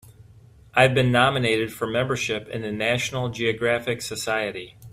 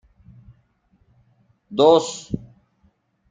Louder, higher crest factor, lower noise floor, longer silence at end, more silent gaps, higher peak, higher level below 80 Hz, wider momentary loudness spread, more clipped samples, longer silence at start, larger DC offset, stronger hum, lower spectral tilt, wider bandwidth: second, -23 LUFS vs -19 LUFS; about the same, 22 dB vs 22 dB; second, -50 dBFS vs -63 dBFS; second, 0.05 s vs 0.95 s; neither; about the same, -2 dBFS vs -2 dBFS; about the same, -54 dBFS vs -54 dBFS; second, 10 LU vs 17 LU; neither; second, 0.2 s vs 1.7 s; neither; neither; about the same, -4.5 dB/octave vs -5 dB/octave; first, 15.5 kHz vs 9.4 kHz